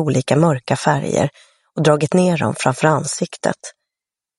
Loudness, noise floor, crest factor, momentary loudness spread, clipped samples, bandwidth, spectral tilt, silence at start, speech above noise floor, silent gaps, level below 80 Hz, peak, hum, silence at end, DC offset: -17 LUFS; -87 dBFS; 18 dB; 8 LU; under 0.1%; 11.5 kHz; -5.5 dB/octave; 0 s; 70 dB; none; -56 dBFS; 0 dBFS; none; 0.7 s; under 0.1%